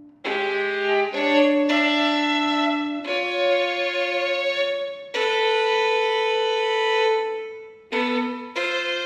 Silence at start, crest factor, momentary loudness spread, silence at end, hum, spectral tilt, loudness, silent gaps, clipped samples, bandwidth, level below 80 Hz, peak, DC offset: 0 s; 16 dB; 8 LU; 0 s; none; -2.5 dB/octave; -22 LUFS; none; under 0.1%; 9.8 kHz; -76 dBFS; -6 dBFS; under 0.1%